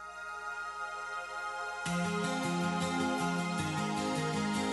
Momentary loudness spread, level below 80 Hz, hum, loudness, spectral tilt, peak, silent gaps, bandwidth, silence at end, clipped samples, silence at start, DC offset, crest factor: 7 LU; -68 dBFS; 60 Hz at -65 dBFS; -34 LUFS; -4.5 dB/octave; -20 dBFS; none; 11.5 kHz; 0 s; under 0.1%; 0 s; under 0.1%; 14 dB